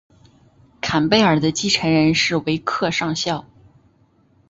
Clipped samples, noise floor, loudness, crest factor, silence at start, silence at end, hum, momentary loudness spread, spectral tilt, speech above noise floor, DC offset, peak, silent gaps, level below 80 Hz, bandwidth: under 0.1%; -57 dBFS; -18 LUFS; 20 dB; 0.85 s; 1.1 s; none; 8 LU; -4.5 dB/octave; 39 dB; under 0.1%; -2 dBFS; none; -50 dBFS; 8 kHz